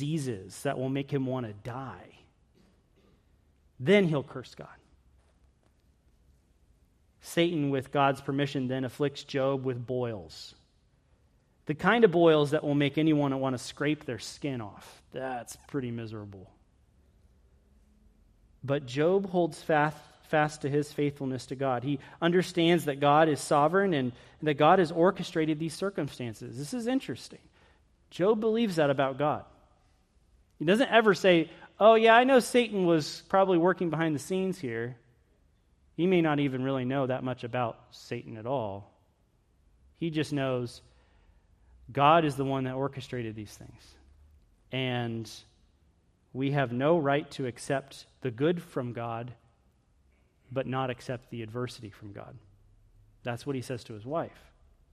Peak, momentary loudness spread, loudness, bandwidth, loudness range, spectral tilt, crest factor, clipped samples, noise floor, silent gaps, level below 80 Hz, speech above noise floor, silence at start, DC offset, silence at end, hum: -8 dBFS; 18 LU; -28 LUFS; 14.5 kHz; 13 LU; -6 dB/octave; 22 dB; under 0.1%; -68 dBFS; none; -64 dBFS; 40 dB; 0 s; under 0.1%; 0.65 s; none